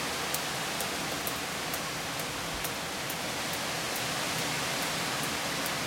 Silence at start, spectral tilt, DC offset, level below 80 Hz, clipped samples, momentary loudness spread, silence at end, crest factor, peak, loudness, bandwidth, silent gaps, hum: 0 s; -2 dB/octave; under 0.1%; -58 dBFS; under 0.1%; 3 LU; 0 s; 24 dB; -10 dBFS; -31 LUFS; 17 kHz; none; none